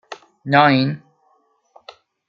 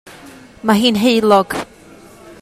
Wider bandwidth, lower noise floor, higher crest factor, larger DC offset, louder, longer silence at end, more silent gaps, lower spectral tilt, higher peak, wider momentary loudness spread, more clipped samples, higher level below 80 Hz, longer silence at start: second, 7 kHz vs 15.5 kHz; first, -62 dBFS vs -41 dBFS; about the same, 18 dB vs 16 dB; neither; about the same, -16 LUFS vs -14 LUFS; first, 1.3 s vs 0.1 s; neither; first, -7 dB/octave vs -5 dB/octave; about the same, -2 dBFS vs 0 dBFS; first, 21 LU vs 13 LU; neither; second, -62 dBFS vs -52 dBFS; about the same, 0.1 s vs 0.05 s